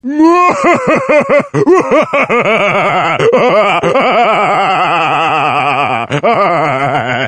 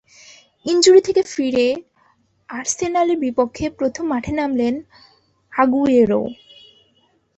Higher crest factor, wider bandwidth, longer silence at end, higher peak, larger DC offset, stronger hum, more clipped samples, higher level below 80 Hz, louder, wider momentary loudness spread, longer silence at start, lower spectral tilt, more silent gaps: second, 10 dB vs 18 dB; first, 10 kHz vs 8.4 kHz; second, 0 s vs 1.05 s; about the same, 0 dBFS vs -2 dBFS; first, 0.2% vs under 0.1%; neither; first, 0.2% vs under 0.1%; about the same, -50 dBFS vs -50 dBFS; first, -10 LUFS vs -18 LUFS; second, 3 LU vs 14 LU; second, 0.05 s vs 0.65 s; first, -5.5 dB/octave vs -4 dB/octave; neither